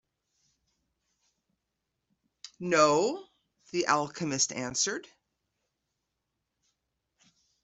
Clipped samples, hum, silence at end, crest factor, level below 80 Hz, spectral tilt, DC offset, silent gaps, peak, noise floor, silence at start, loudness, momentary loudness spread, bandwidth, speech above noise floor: under 0.1%; none; 2.6 s; 26 dB; -74 dBFS; -2.5 dB/octave; under 0.1%; none; -8 dBFS; -84 dBFS; 2.45 s; -28 LUFS; 15 LU; 8.2 kHz; 56 dB